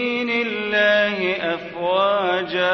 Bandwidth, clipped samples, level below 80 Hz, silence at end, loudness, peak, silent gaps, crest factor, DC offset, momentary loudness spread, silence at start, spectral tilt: 6.4 kHz; under 0.1%; -60 dBFS; 0 s; -20 LUFS; -6 dBFS; none; 14 dB; under 0.1%; 7 LU; 0 s; -5 dB/octave